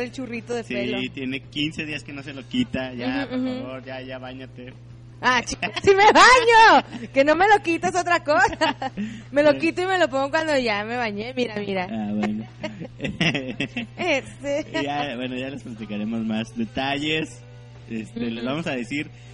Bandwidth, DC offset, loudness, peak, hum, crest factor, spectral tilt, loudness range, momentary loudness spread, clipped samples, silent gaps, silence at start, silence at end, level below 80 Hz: 11 kHz; under 0.1%; -21 LUFS; -4 dBFS; none; 18 dB; -4 dB/octave; 12 LU; 18 LU; under 0.1%; none; 0 s; 0 s; -50 dBFS